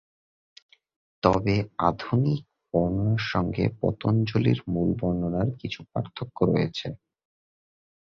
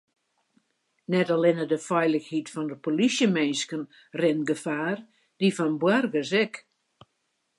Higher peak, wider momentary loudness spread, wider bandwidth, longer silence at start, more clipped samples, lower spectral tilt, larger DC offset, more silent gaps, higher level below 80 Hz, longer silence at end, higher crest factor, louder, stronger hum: first, -4 dBFS vs -8 dBFS; about the same, 9 LU vs 10 LU; second, 7.2 kHz vs 11.5 kHz; first, 1.25 s vs 1.1 s; neither; first, -8 dB/octave vs -5 dB/octave; neither; neither; first, -48 dBFS vs -80 dBFS; about the same, 1.05 s vs 1 s; first, 24 dB vs 18 dB; about the same, -26 LUFS vs -26 LUFS; neither